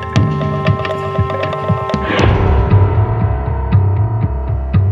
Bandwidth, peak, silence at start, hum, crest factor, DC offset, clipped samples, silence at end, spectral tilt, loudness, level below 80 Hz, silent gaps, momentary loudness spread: 7.2 kHz; 0 dBFS; 0 s; none; 12 dB; under 0.1%; under 0.1%; 0 s; -8 dB/octave; -15 LUFS; -22 dBFS; none; 6 LU